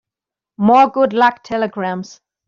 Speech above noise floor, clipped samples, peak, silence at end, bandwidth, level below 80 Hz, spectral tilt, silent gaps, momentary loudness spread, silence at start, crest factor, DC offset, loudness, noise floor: 72 dB; under 0.1%; -2 dBFS; 0.35 s; 7.4 kHz; -60 dBFS; -6.5 dB/octave; none; 13 LU; 0.6 s; 16 dB; under 0.1%; -15 LUFS; -87 dBFS